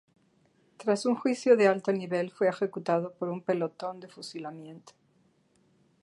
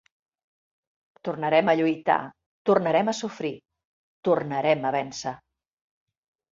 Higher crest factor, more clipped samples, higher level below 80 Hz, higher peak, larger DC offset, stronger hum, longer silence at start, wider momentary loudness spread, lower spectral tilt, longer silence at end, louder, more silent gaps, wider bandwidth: about the same, 22 dB vs 20 dB; neither; second, -82 dBFS vs -70 dBFS; about the same, -8 dBFS vs -6 dBFS; neither; neither; second, 0.8 s vs 1.25 s; first, 19 LU vs 14 LU; about the same, -6 dB/octave vs -5.5 dB/octave; about the same, 1.15 s vs 1.15 s; second, -29 LUFS vs -25 LUFS; second, none vs 2.46-2.65 s, 3.85-4.23 s; first, 11.5 kHz vs 7.8 kHz